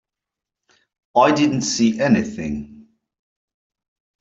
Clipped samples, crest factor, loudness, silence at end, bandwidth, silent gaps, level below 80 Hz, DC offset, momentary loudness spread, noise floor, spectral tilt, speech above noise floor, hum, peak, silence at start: under 0.1%; 18 dB; -18 LUFS; 1.4 s; 8 kHz; none; -54 dBFS; under 0.1%; 12 LU; -86 dBFS; -4.5 dB/octave; 69 dB; none; -4 dBFS; 1.15 s